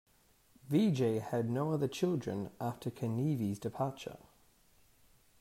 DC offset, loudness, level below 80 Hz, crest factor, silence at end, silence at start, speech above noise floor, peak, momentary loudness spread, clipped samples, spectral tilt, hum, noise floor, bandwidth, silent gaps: under 0.1%; -35 LUFS; -70 dBFS; 16 dB; 1.25 s; 0.65 s; 33 dB; -20 dBFS; 9 LU; under 0.1%; -7.5 dB/octave; none; -67 dBFS; 16 kHz; none